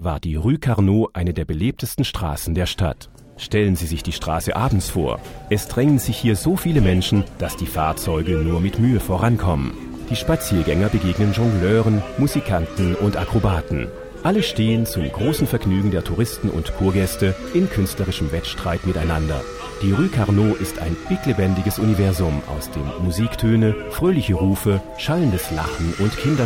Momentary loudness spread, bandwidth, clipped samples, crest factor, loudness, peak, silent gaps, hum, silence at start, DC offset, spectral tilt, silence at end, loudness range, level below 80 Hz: 7 LU; 17.5 kHz; under 0.1%; 16 dB; -20 LUFS; -4 dBFS; none; none; 0 s; under 0.1%; -6.5 dB/octave; 0 s; 2 LU; -32 dBFS